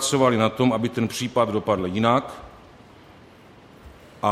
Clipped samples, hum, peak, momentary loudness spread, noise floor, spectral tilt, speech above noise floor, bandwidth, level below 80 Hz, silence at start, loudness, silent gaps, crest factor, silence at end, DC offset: under 0.1%; none; -4 dBFS; 7 LU; -48 dBFS; -5 dB/octave; 27 dB; 15.5 kHz; -54 dBFS; 0 s; -22 LUFS; none; 20 dB; 0 s; under 0.1%